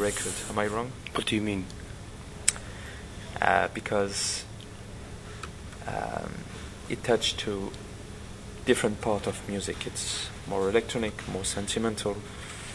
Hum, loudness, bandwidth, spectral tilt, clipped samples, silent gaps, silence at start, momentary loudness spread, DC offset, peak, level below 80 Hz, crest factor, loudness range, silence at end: none; -30 LUFS; 12 kHz; -3.5 dB/octave; under 0.1%; none; 0 s; 16 LU; under 0.1%; -2 dBFS; -48 dBFS; 30 dB; 3 LU; 0 s